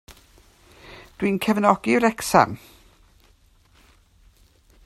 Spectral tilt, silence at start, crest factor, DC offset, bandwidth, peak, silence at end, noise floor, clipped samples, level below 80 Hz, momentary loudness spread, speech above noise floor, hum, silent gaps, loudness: -5 dB/octave; 0.1 s; 24 dB; under 0.1%; 14 kHz; 0 dBFS; 2.3 s; -57 dBFS; under 0.1%; -54 dBFS; 22 LU; 37 dB; none; none; -20 LUFS